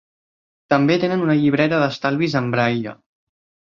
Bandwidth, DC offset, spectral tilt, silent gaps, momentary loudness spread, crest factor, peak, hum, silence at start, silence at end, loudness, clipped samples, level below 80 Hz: 7 kHz; under 0.1%; -7 dB/octave; none; 4 LU; 18 dB; -2 dBFS; none; 0.7 s; 0.85 s; -19 LUFS; under 0.1%; -60 dBFS